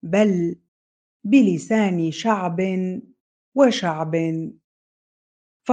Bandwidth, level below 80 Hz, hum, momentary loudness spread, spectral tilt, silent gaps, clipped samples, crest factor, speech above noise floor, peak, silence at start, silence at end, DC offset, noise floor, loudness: 9.2 kHz; -68 dBFS; none; 17 LU; -6.5 dB/octave; 0.68-1.20 s, 3.20-3.52 s, 4.64-5.60 s; under 0.1%; 18 dB; over 70 dB; -4 dBFS; 0.05 s; 0 s; under 0.1%; under -90 dBFS; -21 LUFS